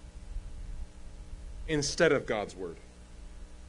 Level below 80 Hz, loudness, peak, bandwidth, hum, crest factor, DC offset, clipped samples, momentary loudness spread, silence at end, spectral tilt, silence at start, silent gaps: -44 dBFS; -30 LUFS; -12 dBFS; 11 kHz; 60 Hz at -55 dBFS; 22 dB; under 0.1%; under 0.1%; 25 LU; 0 s; -4 dB/octave; 0 s; none